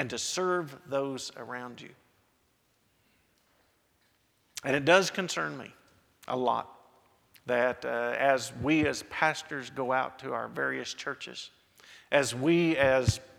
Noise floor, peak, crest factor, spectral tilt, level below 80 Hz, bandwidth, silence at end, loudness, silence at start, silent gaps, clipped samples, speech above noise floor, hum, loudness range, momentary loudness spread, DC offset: -71 dBFS; -6 dBFS; 26 dB; -4.5 dB/octave; -58 dBFS; 16.5 kHz; 0.15 s; -29 LUFS; 0 s; none; under 0.1%; 41 dB; none; 11 LU; 16 LU; under 0.1%